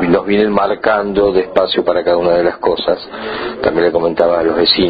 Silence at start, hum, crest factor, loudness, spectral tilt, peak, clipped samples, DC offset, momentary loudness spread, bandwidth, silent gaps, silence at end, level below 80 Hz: 0 s; none; 14 dB; -14 LUFS; -8 dB/octave; 0 dBFS; under 0.1%; under 0.1%; 6 LU; 5 kHz; none; 0 s; -42 dBFS